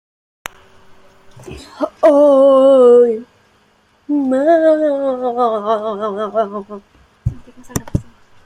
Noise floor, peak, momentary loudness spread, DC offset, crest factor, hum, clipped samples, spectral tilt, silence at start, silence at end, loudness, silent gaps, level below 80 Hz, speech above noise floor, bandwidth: -55 dBFS; 0 dBFS; 24 LU; under 0.1%; 14 dB; none; under 0.1%; -6.5 dB/octave; 1.4 s; 0.45 s; -13 LUFS; none; -42 dBFS; 41 dB; 15.5 kHz